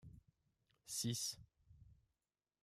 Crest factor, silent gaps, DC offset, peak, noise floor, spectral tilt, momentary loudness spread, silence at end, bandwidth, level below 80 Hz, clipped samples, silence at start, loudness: 20 dB; none; under 0.1%; -30 dBFS; under -90 dBFS; -3 dB/octave; 23 LU; 0.7 s; 15 kHz; -74 dBFS; under 0.1%; 0.05 s; -43 LUFS